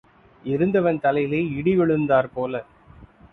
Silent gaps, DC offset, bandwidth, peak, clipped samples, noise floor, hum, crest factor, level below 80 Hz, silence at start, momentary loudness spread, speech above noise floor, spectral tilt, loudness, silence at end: none; under 0.1%; 4.2 kHz; -6 dBFS; under 0.1%; -48 dBFS; none; 16 dB; -54 dBFS; 0.45 s; 9 LU; 28 dB; -10 dB/octave; -22 LUFS; 0.3 s